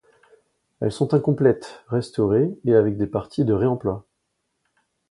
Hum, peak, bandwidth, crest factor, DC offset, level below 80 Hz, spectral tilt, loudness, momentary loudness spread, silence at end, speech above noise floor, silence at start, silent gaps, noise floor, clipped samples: none; -4 dBFS; 11.5 kHz; 18 dB; under 0.1%; -52 dBFS; -8.5 dB/octave; -22 LUFS; 9 LU; 1.1 s; 54 dB; 0.8 s; none; -75 dBFS; under 0.1%